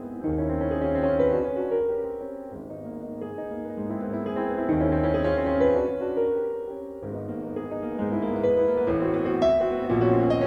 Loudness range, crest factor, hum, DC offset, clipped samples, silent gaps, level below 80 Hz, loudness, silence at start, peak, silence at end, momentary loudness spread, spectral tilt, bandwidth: 4 LU; 16 dB; none; under 0.1%; under 0.1%; none; -44 dBFS; -26 LUFS; 0 s; -10 dBFS; 0 s; 13 LU; -9 dB/octave; 7 kHz